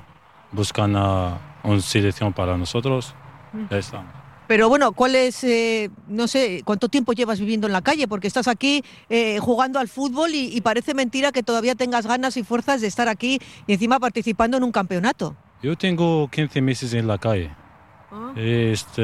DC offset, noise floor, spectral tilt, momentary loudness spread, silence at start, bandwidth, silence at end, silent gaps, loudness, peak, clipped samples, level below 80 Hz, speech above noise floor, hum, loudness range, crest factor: under 0.1%; -50 dBFS; -5 dB/octave; 9 LU; 0.5 s; 13.5 kHz; 0 s; none; -21 LUFS; -4 dBFS; under 0.1%; -50 dBFS; 29 dB; none; 3 LU; 16 dB